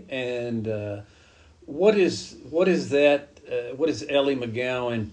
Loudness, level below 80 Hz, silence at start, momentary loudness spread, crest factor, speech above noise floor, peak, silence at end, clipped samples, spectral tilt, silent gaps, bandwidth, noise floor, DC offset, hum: -24 LUFS; -58 dBFS; 0 s; 12 LU; 18 dB; 29 dB; -6 dBFS; 0 s; under 0.1%; -5.5 dB/octave; none; 9.8 kHz; -53 dBFS; under 0.1%; none